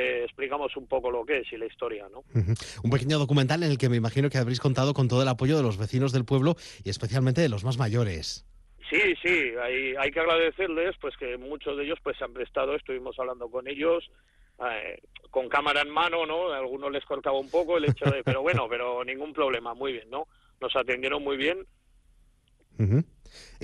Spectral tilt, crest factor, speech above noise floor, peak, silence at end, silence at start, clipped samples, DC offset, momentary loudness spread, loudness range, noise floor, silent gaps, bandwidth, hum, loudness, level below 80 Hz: -6 dB/octave; 16 dB; 36 dB; -12 dBFS; 0 s; 0 s; under 0.1%; under 0.1%; 11 LU; 6 LU; -63 dBFS; none; 12 kHz; none; -27 LUFS; -54 dBFS